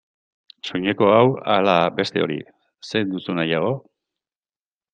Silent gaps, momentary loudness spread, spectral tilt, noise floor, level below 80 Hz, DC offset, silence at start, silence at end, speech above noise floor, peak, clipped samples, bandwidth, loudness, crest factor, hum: none; 14 LU; -6.5 dB/octave; under -90 dBFS; -64 dBFS; under 0.1%; 0.65 s; 1.15 s; over 70 dB; -2 dBFS; under 0.1%; 9 kHz; -20 LUFS; 20 dB; none